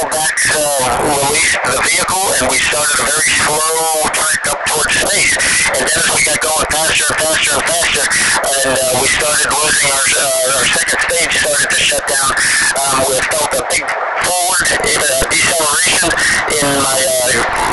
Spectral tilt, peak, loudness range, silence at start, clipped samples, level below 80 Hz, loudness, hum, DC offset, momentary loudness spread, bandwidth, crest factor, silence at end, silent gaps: -0.5 dB/octave; 0 dBFS; 1 LU; 0 s; under 0.1%; -38 dBFS; -11 LUFS; none; under 0.1%; 3 LU; 13 kHz; 14 dB; 0 s; none